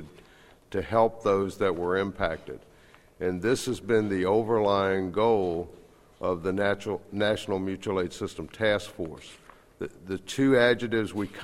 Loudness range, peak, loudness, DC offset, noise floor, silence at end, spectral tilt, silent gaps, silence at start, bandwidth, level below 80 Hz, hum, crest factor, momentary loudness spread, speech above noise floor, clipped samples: 4 LU; -8 dBFS; -27 LUFS; under 0.1%; -56 dBFS; 0 s; -5.5 dB/octave; none; 0 s; 14.5 kHz; -54 dBFS; none; 20 dB; 14 LU; 29 dB; under 0.1%